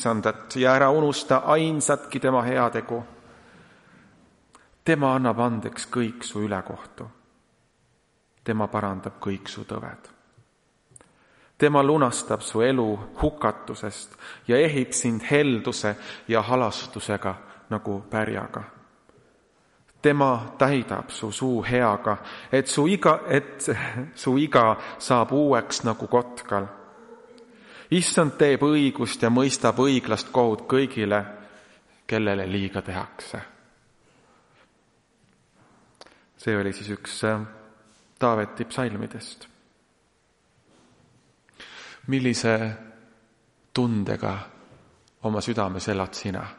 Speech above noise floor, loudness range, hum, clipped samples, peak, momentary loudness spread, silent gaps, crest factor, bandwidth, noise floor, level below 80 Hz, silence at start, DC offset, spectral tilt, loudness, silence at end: 42 dB; 10 LU; none; under 0.1%; -2 dBFS; 16 LU; none; 22 dB; 11.5 kHz; -66 dBFS; -54 dBFS; 0 s; under 0.1%; -5 dB/octave; -24 LUFS; 0.05 s